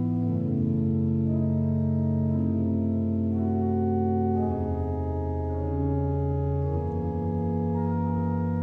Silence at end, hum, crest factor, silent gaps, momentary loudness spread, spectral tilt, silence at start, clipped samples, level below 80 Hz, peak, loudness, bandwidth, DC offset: 0 s; none; 12 dB; none; 4 LU; -12.5 dB/octave; 0 s; under 0.1%; -40 dBFS; -14 dBFS; -27 LUFS; 2.7 kHz; under 0.1%